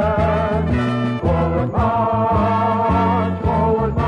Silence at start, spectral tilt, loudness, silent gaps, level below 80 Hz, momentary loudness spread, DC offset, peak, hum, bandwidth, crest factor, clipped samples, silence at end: 0 s; -9 dB/octave; -18 LUFS; none; -30 dBFS; 2 LU; under 0.1%; -4 dBFS; none; 9.8 kHz; 14 dB; under 0.1%; 0 s